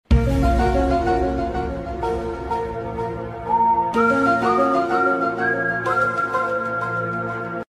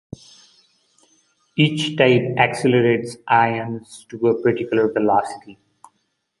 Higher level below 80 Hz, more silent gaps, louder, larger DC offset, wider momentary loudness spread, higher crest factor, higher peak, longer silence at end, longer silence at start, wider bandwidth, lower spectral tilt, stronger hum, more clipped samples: first, -30 dBFS vs -60 dBFS; neither; about the same, -21 LUFS vs -19 LUFS; neither; second, 9 LU vs 17 LU; about the same, 16 dB vs 20 dB; second, -4 dBFS vs 0 dBFS; second, 0.15 s vs 0.85 s; second, 0.1 s vs 1.55 s; about the same, 12 kHz vs 11.5 kHz; first, -7.5 dB/octave vs -6 dB/octave; neither; neither